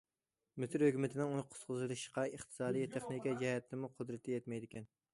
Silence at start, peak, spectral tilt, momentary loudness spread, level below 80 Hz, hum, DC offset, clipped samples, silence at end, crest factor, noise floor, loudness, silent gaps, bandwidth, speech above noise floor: 0.55 s; -22 dBFS; -6 dB/octave; 12 LU; -78 dBFS; none; under 0.1%; under 0.1%; 0.25 s; 18 dB; under -90 dBFS; -40 LUFS; none; 11.5 kHz; over 50 dB